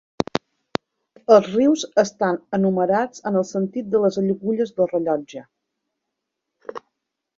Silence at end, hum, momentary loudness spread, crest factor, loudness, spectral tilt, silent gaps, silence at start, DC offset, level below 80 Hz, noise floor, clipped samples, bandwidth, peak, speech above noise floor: 0.6 s; none; 21 LU; 20 dB; -21 LUFS; -6 dB/octave; none; 1.3 s; under 0.1%; -62 dBFS; -81 dBFS; under 0.1%; 7.8 kHz; -2 dBFS; 61 dB